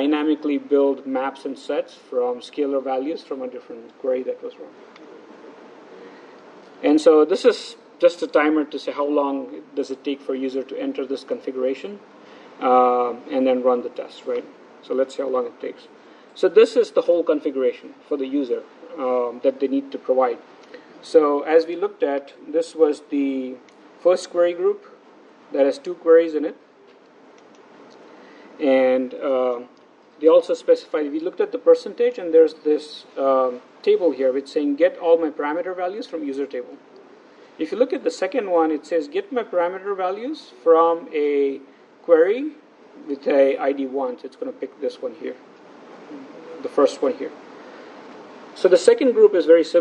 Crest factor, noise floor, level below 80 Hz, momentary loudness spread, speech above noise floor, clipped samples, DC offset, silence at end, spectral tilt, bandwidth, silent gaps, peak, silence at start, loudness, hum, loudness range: 20 dB; -50 dBFS; -82 dBFS; 17 LU; 30 dB; under 0.1%; under 0.1%; 0 s; -4.5 dB/octave; 9.4 kHz; none; 0 dBFS; 0 s; -21 LUFS; none; 7 LU